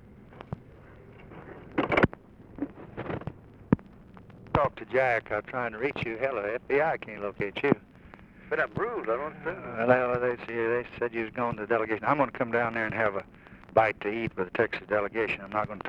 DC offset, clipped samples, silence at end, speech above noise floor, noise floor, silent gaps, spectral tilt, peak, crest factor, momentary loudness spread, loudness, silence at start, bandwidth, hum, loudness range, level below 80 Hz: under 0.1%; under 0.1%; 0 s; 22 dB; -51 dBFS; none; -8 dB/octave; -6 dBFS; 24 dB; 14 LU; -29 LUFS; 0.05 s; 8 kHz; none; 4 LU; -54 dBFS